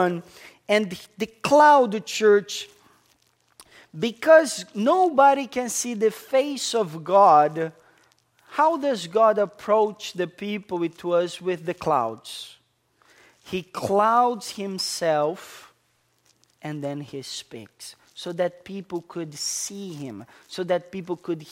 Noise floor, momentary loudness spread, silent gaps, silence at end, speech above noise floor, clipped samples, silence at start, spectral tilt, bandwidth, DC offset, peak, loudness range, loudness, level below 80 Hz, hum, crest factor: -67 dBFS; 20 LU; none; 0 s; 45 dB; under 0.1%; 0 s; -4 dB/octave; 16 kHz; under 0.1%; -2 dBFS; 11 LU; -22 LUFS; -68 dBFS; none; 20 dB